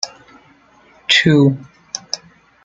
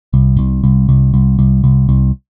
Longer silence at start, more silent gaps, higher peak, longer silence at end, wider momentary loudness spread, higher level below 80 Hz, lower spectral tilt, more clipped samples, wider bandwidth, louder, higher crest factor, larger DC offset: about the same, 0.05 s vs 0.1 s; neither; about the same, 0 dBFS vs 0 dBFS; first, 0.5 s vs 0.2 s; first, 18 LU vs 2 LU; second, -56 dBFS vs -18 dBFS; second, -4.5 dB/octave vs -13.5 dB/octave; neither; first, 9.2 kHz vs 1.3 kHz; second, -15 LUFS vs -12 LUFS; first, 18 dB vs 10 dB; second, under 0.1% vs 0.3%